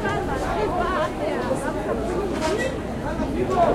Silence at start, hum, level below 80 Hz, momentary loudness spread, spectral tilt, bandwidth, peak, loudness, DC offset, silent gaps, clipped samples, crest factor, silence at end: 0 s; none; -36 dBFS; 3 LU; -6 dB/octave; 16 kHz; -6 dBFS; -25 LUFS; 0.1%; none; under 0.1%; 18 dB; 0 s